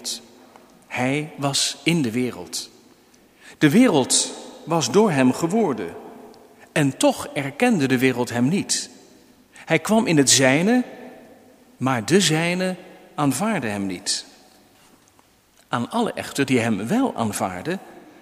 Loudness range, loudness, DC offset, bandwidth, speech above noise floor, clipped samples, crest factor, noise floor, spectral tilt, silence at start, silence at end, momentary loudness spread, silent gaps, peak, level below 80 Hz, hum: 6 LU; -21 LUFS; under 0.1%; 16 kHz; 37 dB; under 0.1%; 22 dB; -57 dBFS; -4 dB/octave; 0 s; 0.25 s; 14 LU; none; -2 dBFS; -64 dBFS; none